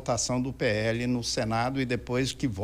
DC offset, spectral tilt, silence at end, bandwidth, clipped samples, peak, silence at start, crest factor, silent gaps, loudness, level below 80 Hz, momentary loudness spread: under 0.1%; -4.5 dB/octave; 0 s; 16 kHz; under 0.1%; -16 dBFS; 0 s; 14 dB; none; -28 LUFS; -48 dBFS; 2 LU